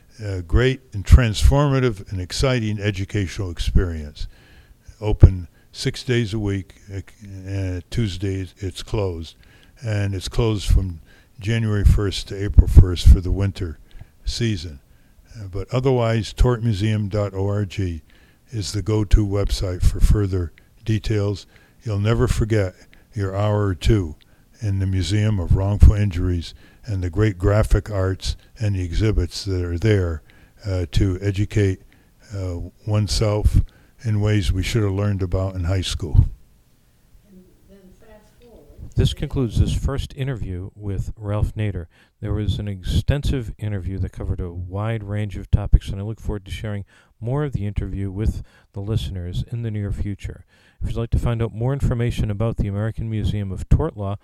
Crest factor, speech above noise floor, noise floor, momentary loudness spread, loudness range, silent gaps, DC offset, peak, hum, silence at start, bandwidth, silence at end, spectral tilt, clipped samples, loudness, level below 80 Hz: 20 dB; 36 dB; -56 dBFS; 14 LU; 7 LU; none; under 0.1%; 0 dBFS; none; 0.2 s; 13 kHz; 0.05 s; -6.5 dB/octave; under 0.1%; -22 LUFS; -24 dBFS